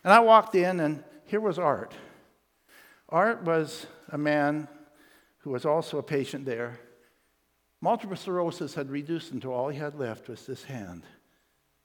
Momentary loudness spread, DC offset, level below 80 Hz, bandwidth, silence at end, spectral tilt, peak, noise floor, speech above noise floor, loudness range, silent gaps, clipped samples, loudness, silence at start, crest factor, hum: 16 LU; under 0.1%; -78 dBFS; 19 kHz; 0.85 s; -6 dB/octave; -2 dBFS; -72 dBFS; 45 dB; 5 LU; none; under 0.1%; -27 LUFS; 0.05 s; 26 dB; none